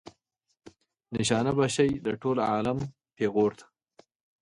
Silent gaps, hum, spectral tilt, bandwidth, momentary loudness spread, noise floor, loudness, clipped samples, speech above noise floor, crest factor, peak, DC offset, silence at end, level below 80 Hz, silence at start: none; none; -5.5 dB/octave; 11.5 kHz; 8 LU; -70 dBFS; -28 LUFS; under 0.1%; 43 dB; 18 dB; -10 dBFS; under 0.1%; 0.8 s; -60 dBFS; 0.05 s